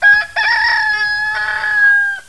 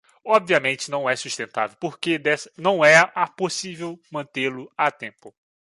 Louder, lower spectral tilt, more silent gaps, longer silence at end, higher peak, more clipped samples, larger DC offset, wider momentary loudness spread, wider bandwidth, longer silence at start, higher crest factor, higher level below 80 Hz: first, -12 LUFS vs -21 LUFS; second, 0 dB/octave vs -3.5 dB/octave; neither; second, 0.05 s vs 0.4 s; about the same, -2 dBFS vs -2 dBFS; neither; first, 0.7% vs under 0.1%; second, 6 LU vs 17 LU; about the same, 11 kHz vs 11.5 kHz; second, 0 s vs 0.25 s; second, 12 dB vs 20 dB; first, -50 dBFS vs -74 dBFS